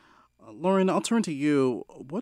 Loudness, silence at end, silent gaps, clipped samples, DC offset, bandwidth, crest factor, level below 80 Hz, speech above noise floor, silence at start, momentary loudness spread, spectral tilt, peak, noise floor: -26 LUFS; 0 s; none; under 0.1%; under 0.1%; 13 kHz; 14 dB; -72 dBFS; 29 dB; 0.45 s; 10 LU; -6 dB/octave; -12 dBFS; -54 dBFS